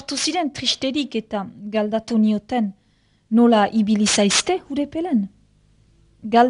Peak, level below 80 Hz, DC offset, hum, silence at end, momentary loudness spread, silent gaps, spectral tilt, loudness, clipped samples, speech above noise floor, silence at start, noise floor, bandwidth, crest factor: -2 dBFS; -56 dBFS; under 0.1%; none; 0 s; 11 LU; none; -3.5 dB/octave; -20 LUFS; under 0.1%; 41 dB; 0 s; -60 dBFS; 11 kHz; 18 dB